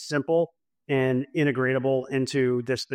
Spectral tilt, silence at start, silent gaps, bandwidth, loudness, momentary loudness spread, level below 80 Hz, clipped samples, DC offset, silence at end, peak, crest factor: -6 dB/octave; 0 s; none; 13 kHz; -25 LUFS; 3 LU; -68 dBFS; under 0.1%; under 0.1%; 0 s; -12 dBFS; 12 dB